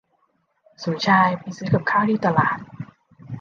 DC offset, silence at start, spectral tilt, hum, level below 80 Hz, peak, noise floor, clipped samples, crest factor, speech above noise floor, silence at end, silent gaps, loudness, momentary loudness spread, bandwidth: under 0.1%; 0.8 s; -6.5 dB/octave; none; -60 dBFS; -4 dBFS; -67 dBFS; under 0.1%; 18 dB; 47 dB; 0 s; none; -20 LUFS; 21 LU; 7.2 kHz